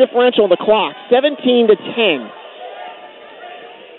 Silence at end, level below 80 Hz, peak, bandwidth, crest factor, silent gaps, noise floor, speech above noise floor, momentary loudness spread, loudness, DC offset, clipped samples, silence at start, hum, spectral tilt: 0.25 s; -62 dBFS; 0 dBFS; 4.2 kHz; 16 dB; none; -37 dBFS; 23 dB; 22 LU; -14 LUFS; under 0.1%; under 0.1%; 0 s; none; -9.5 dB/octave